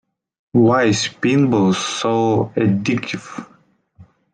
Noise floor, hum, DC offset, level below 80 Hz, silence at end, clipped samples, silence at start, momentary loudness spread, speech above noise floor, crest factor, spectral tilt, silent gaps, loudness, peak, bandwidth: -55 dBFS; none; under 0.1%; -54 dBFS; 0.3 s; under 0.1%; 0.55 s; 12 LU; 38 dB; 16 dB; -5.5 dB/octave; none; -17 LUFS; -2 dBFS; 9.8 kHz